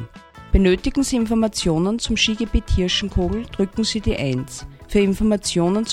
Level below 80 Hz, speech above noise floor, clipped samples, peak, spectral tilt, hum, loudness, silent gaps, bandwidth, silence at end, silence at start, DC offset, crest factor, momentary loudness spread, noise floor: -28 dBFS; 21 dB; under 0.1%; -2 dBFS; -5 dB/octave; none; -20 LUFS; none; 13.5 kHz; 0 s; 0 s; under 0.1%; 18 dB; 6 LU; -40 dBFS